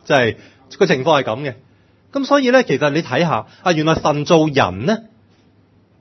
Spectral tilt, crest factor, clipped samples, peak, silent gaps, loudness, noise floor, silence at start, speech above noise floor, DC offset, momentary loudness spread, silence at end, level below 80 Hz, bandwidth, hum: -5.5 dB/octave; 18 dB; under 0.1%; 0 dBFS; none; -16 LUFS; -53 dBFS; 0.05 s; 37 dB; under 0.1%; 11 LU; 1 s; -52 dBFS; 6.4 kHz; none